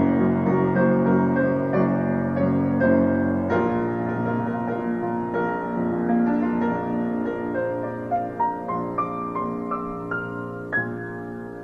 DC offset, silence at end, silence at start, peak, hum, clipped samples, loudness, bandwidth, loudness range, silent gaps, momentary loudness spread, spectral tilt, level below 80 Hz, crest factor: 0.1%; 0 s; 0 s; -8 dBFS; none; under 0.1%; -24 LUFS; 4.2 kHz; 6 LU; none; 9 LU; -10 dB/octave; -48 dBFS; 16 dB